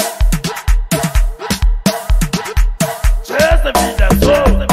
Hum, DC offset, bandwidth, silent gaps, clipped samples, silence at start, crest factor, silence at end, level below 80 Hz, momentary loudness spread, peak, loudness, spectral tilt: none; under 0.1%; 16 kHz; none; under 0.1%; 0 s; 12 dB; 0 s; -14 dBFS; 7 LU; 0 dBFS; -15 LUFS; -4.5 dB/octave